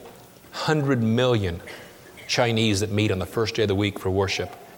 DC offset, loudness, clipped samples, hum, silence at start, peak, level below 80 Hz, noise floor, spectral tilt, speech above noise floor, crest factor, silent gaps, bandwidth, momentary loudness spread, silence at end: under 0.1%; -23 LUFS; under 0.1%; none; 0 s; -6 dBFS; -54 dBFS; -46 dBFS; -5.5 dB/octave; 23 dB; 18 dB; none; 18.5 kHz; 17 LU; 0 s